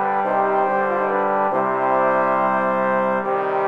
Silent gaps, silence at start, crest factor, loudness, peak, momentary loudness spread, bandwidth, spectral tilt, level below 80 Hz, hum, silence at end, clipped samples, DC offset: none; 0 s; 12 dB; -19 LUFS; -6 dBFS; 2 LU; 6.6 kHz; -8 dB/octave; -68 dBFS; none; 0 s; under 0.1%; 0.3%